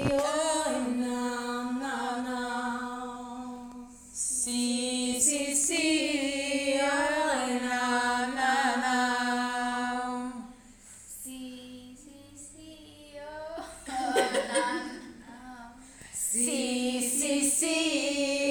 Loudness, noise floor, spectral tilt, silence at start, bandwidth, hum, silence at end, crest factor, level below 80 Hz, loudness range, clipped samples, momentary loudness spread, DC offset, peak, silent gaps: -28 LUFS; -52 dBFS; -2 dB/octave; 0 s; over 20 kHz; none; 0 s; 20 dB; -60 dBFS; 10 LU; under 0.1%; 21 LU; under 0.1%; -12 dBFS; none